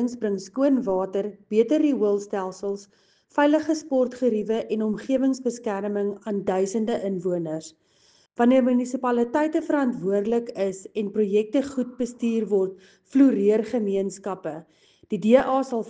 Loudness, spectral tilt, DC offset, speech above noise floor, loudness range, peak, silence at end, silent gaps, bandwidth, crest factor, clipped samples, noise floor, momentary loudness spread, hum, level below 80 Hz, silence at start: -24 LUFS; -6.5 dB/octave; under 0.1%; 37 dB; 2 LU; -4 dBFS; 0 s; none; 9.4 kHz; 20 dB; under 0.1%; -61 dBFS; 11 LU; none; -66 dBFS; 0 s